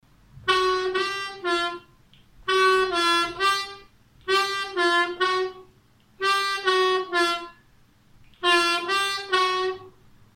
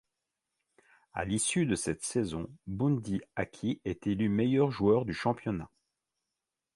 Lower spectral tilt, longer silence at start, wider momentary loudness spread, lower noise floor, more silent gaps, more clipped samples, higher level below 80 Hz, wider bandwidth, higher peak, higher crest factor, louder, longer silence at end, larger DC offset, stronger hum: second, -1.5 dB/octave vs -5.5 dB/octave; second, 0.35 s vs 1.15 s; about the same, 11 LU vs 11 LU; second, -58 dBFS vs -88 dBFS; neither; neither; about the same, -58 dBFS vs -56 dBFS; first, 16 kHz vs 11.5 kHz; first, -8 dBFS vs -14 dBFS; about the same, 16 dB vs 18 dB; first, -23 LUFS vs -31 LUFS; second, 0.45 s vs 1.1 s; neither; neither